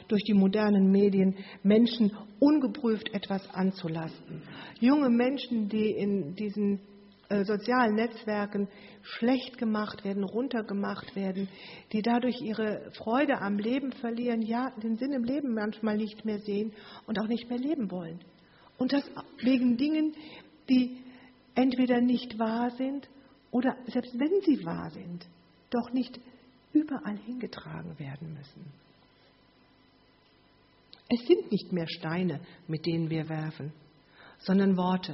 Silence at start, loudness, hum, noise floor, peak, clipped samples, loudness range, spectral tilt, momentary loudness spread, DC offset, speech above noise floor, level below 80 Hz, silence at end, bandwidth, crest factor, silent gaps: 0 s; -29 LUFS; none; -63 dBFS; -10 dBFS; under 0.1%; 7 LU; -6 dB/octave; 16 LU; under 0.1%; 34 dB; -70 dBFS; 0 s; 5.8 kHz; 20 dB; none